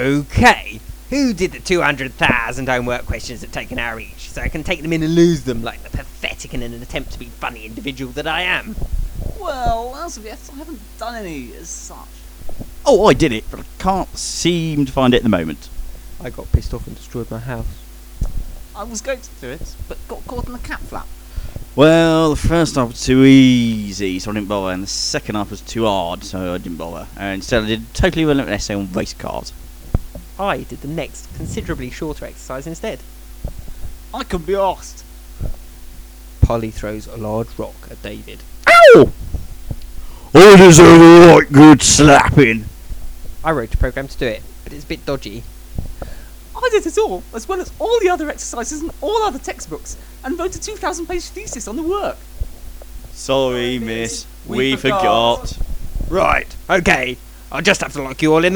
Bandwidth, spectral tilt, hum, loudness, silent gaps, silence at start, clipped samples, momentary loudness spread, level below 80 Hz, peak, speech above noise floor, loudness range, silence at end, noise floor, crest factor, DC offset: over 20 kHz; -5 dB/octave; none; -13 LUFS; none; 0 s; under 0.1%; 23 LU; -30 dBFS; 0 dBFS; 21 dB; 19 LU; 0 s; -35 dBFS; 16 dB; under 0.1%